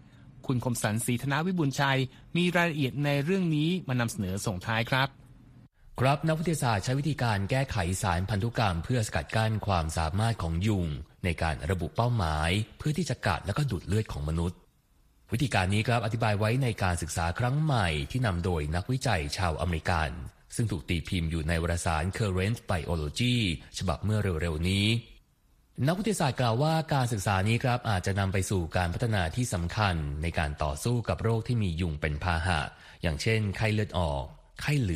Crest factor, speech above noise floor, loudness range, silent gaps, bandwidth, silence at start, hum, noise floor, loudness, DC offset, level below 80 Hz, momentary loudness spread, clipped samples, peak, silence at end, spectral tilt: 18 dB; 36 dB; 2 LU; none; 15 kHz; 0.15 s; none; -64 dBFS; -29 LUFS; under 0.1%; -42 dBFS; 5 LU; under 0.1%; -10 dBFS; 0 s; -5.5 dB/octave